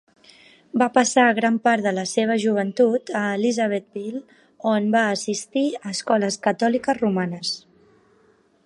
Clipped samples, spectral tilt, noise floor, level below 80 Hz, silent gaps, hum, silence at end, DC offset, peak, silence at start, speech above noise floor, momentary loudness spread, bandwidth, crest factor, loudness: under 0.1%; -4.5 dB/octave; -59 dBFS; -70 dBFS; none; none; 1.05 s; under 0.1%; -4 dBFS; 0.75 s; 38 dB; 10 LU; 11.5 kHz; 18 dB; -21 LUFS